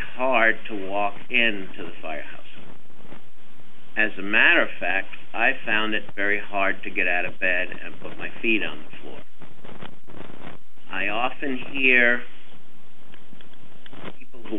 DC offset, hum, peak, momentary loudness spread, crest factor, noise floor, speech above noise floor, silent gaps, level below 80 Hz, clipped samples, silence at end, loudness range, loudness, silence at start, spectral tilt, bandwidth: 8%; none; -4 dBFS; 24 LU; 22 dB; -55 dBFS; 30 dB; none; -68 dBFS; under 0.1%; 0 s; 8 LU; -22 LUFS; 0 s; -6 dB/octave; 13.5 kHz